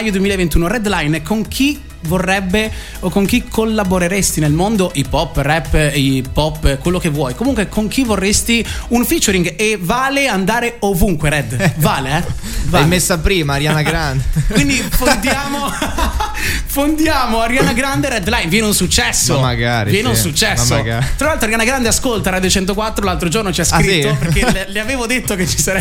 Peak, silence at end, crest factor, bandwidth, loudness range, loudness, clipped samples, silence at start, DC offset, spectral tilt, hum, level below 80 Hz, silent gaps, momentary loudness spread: 0 dBFS; 0 s; 14 dB; 17 kHz; 2 LU; -15 LUFS; under 0.1%; 0 s; under 0.1%; -4 dB/octave; none; -24 dBFS; none; 5 LU